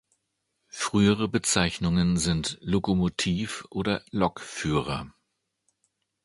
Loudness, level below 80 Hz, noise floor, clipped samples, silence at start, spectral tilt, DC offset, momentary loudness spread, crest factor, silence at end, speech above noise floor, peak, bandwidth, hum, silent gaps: -26 LUFS; -46 dBFS; -78 dBFS; under 0.1%; 0.75 s; -4.5 dB/octave; under 0.1%; 10 LU; 22 dB; 1.15 s; 53 dB; -6 dBFS; 11.5 kHz; none; none